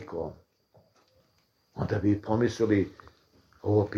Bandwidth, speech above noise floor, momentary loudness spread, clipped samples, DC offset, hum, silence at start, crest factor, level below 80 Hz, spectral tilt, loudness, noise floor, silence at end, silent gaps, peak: 10 kHz; 43 dB; 11 LU; under 0.1%; under 0.1%; none; 0 s; 18 dB; -56 dBFS; -8 dB/octave; -29 LUFS; -70 dBFS; 0 s; none; -12 dBFS